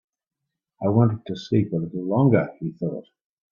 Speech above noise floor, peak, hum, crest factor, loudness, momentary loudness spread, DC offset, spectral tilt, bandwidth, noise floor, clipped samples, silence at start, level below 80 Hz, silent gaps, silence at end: 62 dB; -4 dBFS; none; 20 dB; -23 LUFS; 11 LU; under 0.1%; -9.5 dB/octave; 7 kHz; -84 dBFS; under 0.1%; 0.8 s; -58 dBFS; none; 0.5 s